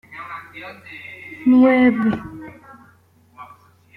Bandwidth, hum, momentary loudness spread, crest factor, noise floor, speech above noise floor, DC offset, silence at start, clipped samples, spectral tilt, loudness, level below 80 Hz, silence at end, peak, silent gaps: 4.5 kHz; none; 23 LU; 16 dB; -54 dBFS; 36 dB; under 0.1%; 0.1 s; under 0.1%; -8 dB/octave; -16 LUFS; -56 dBFS; 0.5 s; -6 dBFS; none